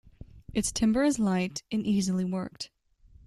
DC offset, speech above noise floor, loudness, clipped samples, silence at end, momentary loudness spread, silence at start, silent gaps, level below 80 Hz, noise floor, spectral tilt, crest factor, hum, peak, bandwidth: under 0.1%; 30 dB; -28 LUFS; under 0.1%; 0.6 s; 12 LU; 0.2 s; none; -52 dBFS; -58 dBFS; -5 dB/octave; 16 dB; none; -14 dBFS; 13 kHz